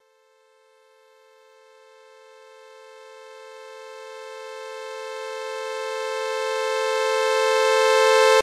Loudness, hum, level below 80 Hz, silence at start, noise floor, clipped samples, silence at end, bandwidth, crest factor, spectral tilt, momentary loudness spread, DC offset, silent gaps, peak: -22 LUFS; none; -88 dBFS; 2.65 s; -60 dBFS; under 0.1%; 0 s; 15 kHz; 18 dB; 1.5 dB/octave; 25 LU; under 0.1%; none; -6 dBFS